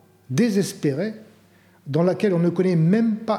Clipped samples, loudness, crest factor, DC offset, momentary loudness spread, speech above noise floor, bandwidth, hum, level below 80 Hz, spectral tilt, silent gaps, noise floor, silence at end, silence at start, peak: under 0.1%; -21 LUFS; 14 dB; under 0.1%; 9 LU; 34 dB; 14.5 kHz; none; -76 dBFS; -7 dB/octave; none; -55 dBFS; 0 s; 0.3 s; -8 dBFS